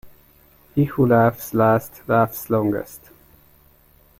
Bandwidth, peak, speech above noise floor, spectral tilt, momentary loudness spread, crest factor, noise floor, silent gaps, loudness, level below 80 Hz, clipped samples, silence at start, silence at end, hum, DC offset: 16.5 kHz; -4 dBFS; 35 dB; -8 dB/octave; 10 LU; 16 dB; -54 dBFS; none; -20 LUFS; -52 dBFS; under 0.1%; 0.05 s; 1.2 s; none; under 0.1%